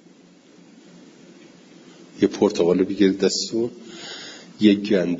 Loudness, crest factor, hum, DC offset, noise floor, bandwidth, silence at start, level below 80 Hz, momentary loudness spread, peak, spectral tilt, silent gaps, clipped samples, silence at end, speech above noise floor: -20 LUFS; 20 dB; none; under 0.1%; -51 dBFS; 7.8 kHz; 2.15 s; -64 dBFS; 17 LU; -2 dBFS; -5 dB/octave; none; under 0.1%; 0 s; 31 dB